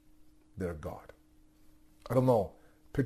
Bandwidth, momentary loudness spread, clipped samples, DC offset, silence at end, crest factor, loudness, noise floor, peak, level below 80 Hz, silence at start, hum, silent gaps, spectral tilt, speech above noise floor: 13.5 kHz; 24 LU; under 0.1%; under 0.1%; 0 s; 20 dB; -33 LUFS; -62 dBFS; -14 dBFS; -58 dBFS; 0.55 s; none; none; -8.5 dB/octave; 31 dB